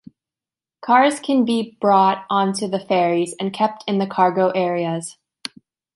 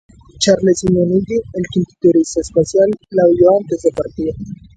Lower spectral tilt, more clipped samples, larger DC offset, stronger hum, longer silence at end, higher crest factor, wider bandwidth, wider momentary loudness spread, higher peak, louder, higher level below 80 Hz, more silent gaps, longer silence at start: about the same, -5 dB/octave vs -6 dB/octave; neither; neither; neither; first, 0.85 s vs 0.2 s; about the same, 18 dB vs 14 dB; first, 11.5 kHz vs 9.4 kHz; first, 18 LU vs 9 LU; about the same, -2 dBFS vs 0 dBFS; second, -19 LUFS vs -15 LUFS; second, -70 dBFS vs -42 dBFS; neither; first, 0.85 s vs 0.4 s